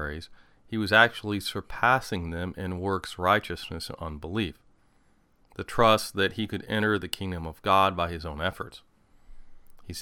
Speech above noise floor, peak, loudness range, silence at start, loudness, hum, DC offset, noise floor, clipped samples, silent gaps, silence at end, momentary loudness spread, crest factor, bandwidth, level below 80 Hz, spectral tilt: 36 dB; -4 dBFS; 5 LU; 0 s; -27 LUFS; none; under 0.1%; -63 dBFS; under 0.1%; none; 0 s; 14 LU; 24 dB; 17.5 kHz; -48 dBFS; -4.5 dB/octave